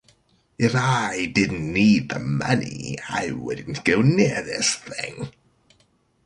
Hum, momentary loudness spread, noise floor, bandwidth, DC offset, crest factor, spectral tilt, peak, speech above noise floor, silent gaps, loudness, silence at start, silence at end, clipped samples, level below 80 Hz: none; 13 LU; -63 dBFS; 11.5 kHz; under 0.1%; 20 dB; -5 dB/octave; -4 dBFS; 41 dB; none; -22 LUFS; 0.6 s; 0.95 s; under 0.1%; -52 dBFS